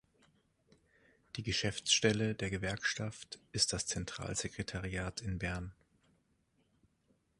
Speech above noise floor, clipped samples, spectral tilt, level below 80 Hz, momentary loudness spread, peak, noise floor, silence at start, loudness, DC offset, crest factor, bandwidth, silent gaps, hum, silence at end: 39 dB; under 0.1%; -3 dB/octave; -56 dBFS; 14 LU; -14 dBFS; -76 dBFS; 1.35 s; -36 LUFS; under 0.1%; 24 dB; 11.5 kHz; none; none; 1.65 s